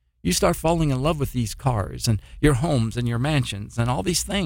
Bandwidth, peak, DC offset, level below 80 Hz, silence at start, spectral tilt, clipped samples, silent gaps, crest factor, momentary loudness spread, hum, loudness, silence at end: 17 kHz; -4 dBFS; under 0.1%; -36 dBFS; 0.25 s; -5 dB/octave; under 0.1%; none; 18 dB; 4 LU; none; -23 LUFS; 0 s